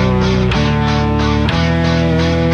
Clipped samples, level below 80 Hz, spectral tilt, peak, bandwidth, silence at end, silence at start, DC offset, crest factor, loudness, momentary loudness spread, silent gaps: under 0.1%; -24 dBFS; -6.5 dB/octave; -2 dBFS; 8.4 kHz; 0 s; 0 s; under 0.1%; 10 dB; -14 LUFS; 1 LU; none